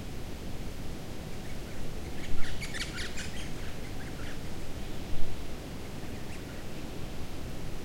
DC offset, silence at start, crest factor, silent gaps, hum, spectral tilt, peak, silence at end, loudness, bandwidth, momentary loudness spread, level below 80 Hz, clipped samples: under 0.1%; 0 s; 18 dB; none; none; -4.5 dB/octave; -10 dBFS; 0 s; -40 LUFS; 16 kHz; 5 LU; -40 dBFS; under 0.1%